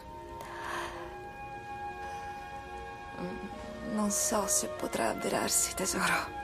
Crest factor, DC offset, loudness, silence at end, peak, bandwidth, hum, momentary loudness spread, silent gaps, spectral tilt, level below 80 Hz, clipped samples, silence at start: 20 dB; under 0.1%; -33 LUFS; 0 s; -16 dBFS; 15.5 kHz; none; 15 LU; none; -2.5 dB/octave; -54 dBFS; under 0.1%; 0 s